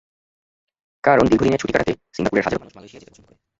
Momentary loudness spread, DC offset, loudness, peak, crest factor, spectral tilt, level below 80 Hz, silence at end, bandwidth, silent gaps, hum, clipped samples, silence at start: 10 LU; under 0.1%; -19 LUFS; -2 dBFS; 20 dB; -6.5 dB/octave; -44 dBFS; 0.7 s; 8 kHz; none; none; under 0.1%; 1.05 s